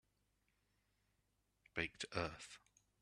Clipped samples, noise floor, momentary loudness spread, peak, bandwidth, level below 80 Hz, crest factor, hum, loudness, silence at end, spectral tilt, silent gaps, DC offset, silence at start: under 0.1%; -83 dBFS; 13 LU; -24 dBFS; 12 kHz; -70 dBFS; 28 dB; 50 Hz at -80 dBFS; -46 LUFS; 0.45 s; -4 dB/octave; none; under 0.1%; 1.75 s